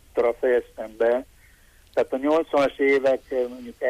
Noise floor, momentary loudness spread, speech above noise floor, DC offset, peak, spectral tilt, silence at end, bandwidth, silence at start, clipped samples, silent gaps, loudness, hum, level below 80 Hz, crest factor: -54 dBFS; 8 LU; 31 dB; under 0.1%; -10 dBFS; -5 dB/octave; 0 s; 14.5 kHz; 0.15 s; under 0.1%; none; -23 LUFS; none; -56 dBFS; 12 dB